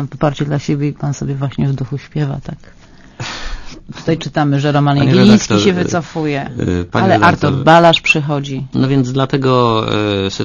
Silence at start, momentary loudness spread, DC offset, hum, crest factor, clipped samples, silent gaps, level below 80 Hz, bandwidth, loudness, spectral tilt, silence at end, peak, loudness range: 0 s; 15 LU; under 0.1%; none; 14 dB; 0.2%; none; -38 dBFS; 7.4 kHz; -14 LUFS; -6 dB/octave; 0 s; 0 dBFS; 9 LU